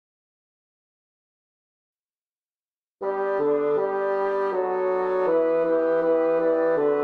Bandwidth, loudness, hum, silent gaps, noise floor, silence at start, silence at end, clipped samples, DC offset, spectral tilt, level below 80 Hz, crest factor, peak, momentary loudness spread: 4.7 kHz; -23 LUFS; none; none; under -90 dBFS; 3 s; 0 s; under 0.1%; under 0.1%; -8 dB/octave; -68 dBFS; 12 dB; -12 dBFS; 3 LU